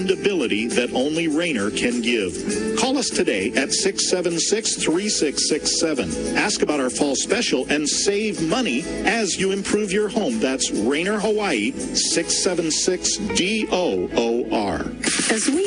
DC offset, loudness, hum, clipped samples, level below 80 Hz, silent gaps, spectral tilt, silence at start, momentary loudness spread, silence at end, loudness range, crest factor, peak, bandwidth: under 0.1%; -20 LUFS; none; under 0.1%; -48 dBFS; none; -2.5 dB/octave; 0 s; 3 LU; 0 s; 1 LU; 18 dB; -2 dBFS; 10.5 kHz